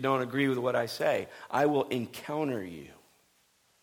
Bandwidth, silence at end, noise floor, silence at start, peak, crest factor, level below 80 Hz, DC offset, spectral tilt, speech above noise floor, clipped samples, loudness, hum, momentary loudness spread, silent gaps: 19 kHz; 0.9 s; -69 dBFS; 0 s; -14 dBFS; 18 dB; -72 dBFS; under 0.1%; -6 dB/octave; 39 dB; under 0.1%; -30 LUFS; none; 9 LU; none